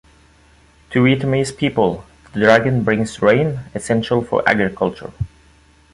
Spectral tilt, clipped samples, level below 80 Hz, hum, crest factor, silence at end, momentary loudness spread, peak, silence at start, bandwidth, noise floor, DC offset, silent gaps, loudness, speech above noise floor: -6 dB/octave; under 0.1%; -44 dBFS; none; 18 dB; 0.65 s; 15 LU; 0 dBFS; 0.9 s; 11.5 kHz; -51 dBFS; under 0.1%; none; -17 LUFS; 34 dB